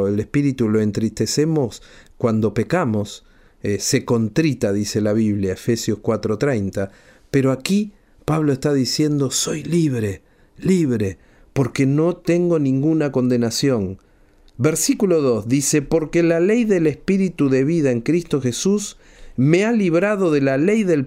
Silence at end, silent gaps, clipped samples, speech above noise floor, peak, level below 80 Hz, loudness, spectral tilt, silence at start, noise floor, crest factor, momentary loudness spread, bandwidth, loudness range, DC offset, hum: 0 s; none; under 0.1%; 33 dB; -2 dBFS; -48 dBFS; -19 LUFS; -5.5 dB/octave; 0 s; -51 dBFS; 16 dB; 8 LU; 16 kHz; 3 LU; under 0.1%; none